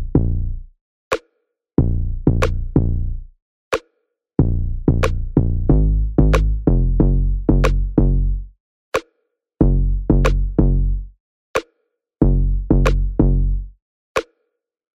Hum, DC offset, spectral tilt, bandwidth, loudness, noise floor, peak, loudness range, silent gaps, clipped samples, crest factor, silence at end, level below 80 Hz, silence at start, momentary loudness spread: none; under 0.1%; -8 dB/octave; 8 kHz; -20 LUFS; -74 dBFS; 0 dBFS; 4 LU; 0.81-1.11 s, 3.42-3.71 s, 8.60-8.92 s, 11.20-11.54 s, 13.82-14.15 s; under 0.1%; 18 dB; 0.75 s; -20 dBFS; 0 s; 8 LU